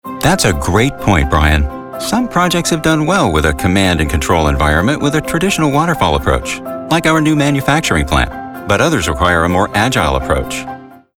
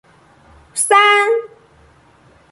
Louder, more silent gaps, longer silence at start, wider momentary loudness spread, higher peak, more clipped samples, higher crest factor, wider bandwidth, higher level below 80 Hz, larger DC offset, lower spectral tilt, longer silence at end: about the same, -13 LUFS vs -13 LUFS; neither; second, 0.05 s vs 0.75 s; second, 6 LU vs 12 LU; about the same, 0 dBFS vs 0 dBFS; neither; about the same, 12 dB vs 16 dB; first, 18.5 kHz vs 12 kHz; first, -24 dBFS vs -58 dBFS; neither; first, -5 dB/octave vs 0.5 dB/octave; second, 0.2 s vs 1.05 s